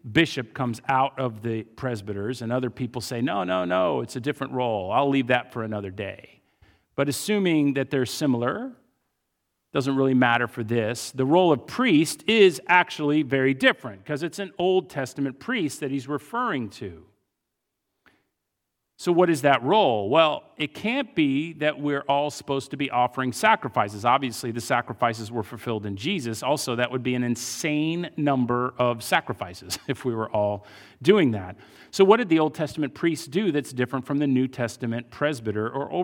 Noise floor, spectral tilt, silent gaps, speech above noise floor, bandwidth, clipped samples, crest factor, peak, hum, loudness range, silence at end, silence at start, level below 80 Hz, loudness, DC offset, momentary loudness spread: -81 dBFS; -5 dB/octave; none; 57 dB; 18 kHz; under 0.1%; 22 dB; -2 dBFS; none; 6 LU; 0 s; 0.05 s; -66 dBFS; -24 LUFS; under 0.1%; 11 LU